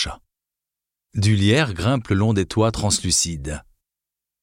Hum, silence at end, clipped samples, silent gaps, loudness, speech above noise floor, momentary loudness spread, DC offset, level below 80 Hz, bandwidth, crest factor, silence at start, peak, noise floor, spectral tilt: none; 0.85 s; under 0.1%; none; -20 LUFS; 67 dB; 13 LU; under 0.1%; -42 dBFS; 16 kHz; 18 dB; 0 s; -4 dBFS; -87 dBFS; -4.5 dB/octave